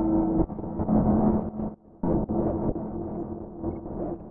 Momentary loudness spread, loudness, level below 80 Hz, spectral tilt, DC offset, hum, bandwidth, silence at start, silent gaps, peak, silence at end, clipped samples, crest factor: 12 LU; -28 LUFS; -40 dBFS; -15 dB/octave; under 0.1%; none; 2.3 kHz; 0 s; none; -10 dBFS; 0 s; under 0.1%; 16 dB